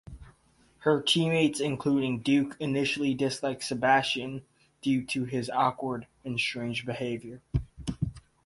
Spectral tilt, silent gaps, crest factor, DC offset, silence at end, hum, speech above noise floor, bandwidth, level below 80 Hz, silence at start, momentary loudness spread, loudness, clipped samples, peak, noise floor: -5 dB/octave; none; 20 dB; under 0.1%; 0.25 s; none; 35 dB; 11.5 kHz; -50 dBFS; 0.05 s; 11 LU; -29 LUFS; under 0.1%; -10 dBFS; -64 dBFS